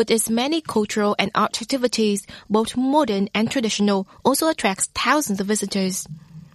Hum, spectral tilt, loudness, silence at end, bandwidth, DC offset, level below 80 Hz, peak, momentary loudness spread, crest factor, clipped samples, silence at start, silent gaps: none; -3.5 dB/octave; -21 LUFS; 0.1 s; 14 kHz; under 0.1%; -56 dBFS; -2 dBFS; 4 LU; 18 dB; under 0.1%; 0 s; none